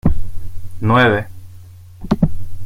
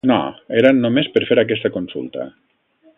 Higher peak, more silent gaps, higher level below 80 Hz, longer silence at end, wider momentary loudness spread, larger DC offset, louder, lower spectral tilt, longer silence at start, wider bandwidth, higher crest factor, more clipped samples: about the same, -2 dBFS vs 0 dBFS; neither; first, -26 dBFS vs -58 dBFS; second, 0 s vs 0.7 s; first, 22 LU vs 15 LU; neither; about the same, -17 LUFS vs -17 LUFS; about the same, -7.5 dB/octave vs -8 dB/octave; about the same, 0.05 s vs 0.05 s; first, 6.4 kHz vs 4 kHz; about the same, 14 dB vs 18 dB; neither